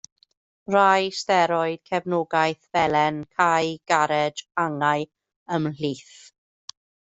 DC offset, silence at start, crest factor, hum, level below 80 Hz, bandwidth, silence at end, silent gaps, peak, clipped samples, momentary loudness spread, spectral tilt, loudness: under 0.1%; 0.7 s; 20 dB; none; -64 dBFS; 8.2 kHz; 1 s; 5.36-5.46 s; -4 dBFS; under 0.1%; 17 LU; -4.5 dB/octave; -23 LUFS